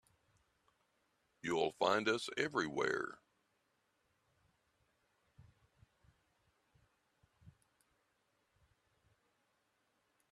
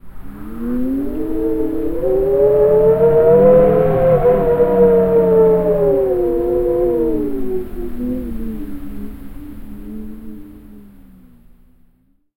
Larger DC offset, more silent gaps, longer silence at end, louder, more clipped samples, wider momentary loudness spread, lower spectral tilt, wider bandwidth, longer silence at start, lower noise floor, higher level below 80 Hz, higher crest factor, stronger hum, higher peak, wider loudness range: neither; neither; first, 2.8 s vs 1.55 s; second, -37 LUFS vs -14 LUFS; neither; second, 8 LU vs 21 LU; second, -4 dB/octave vs -10 dB/octave; second, 13 kHz vs 16.5 kHz; first, 1.45 s vs 0.05 s; first, -81 dBFS vs -56 dBFS; second, -80 dBFS vs -32 dBFS; first, 26 dB vs 14 dB; neither; second, -18 dBFS vs 0 dBFS; second, 8 LU vs 17 LU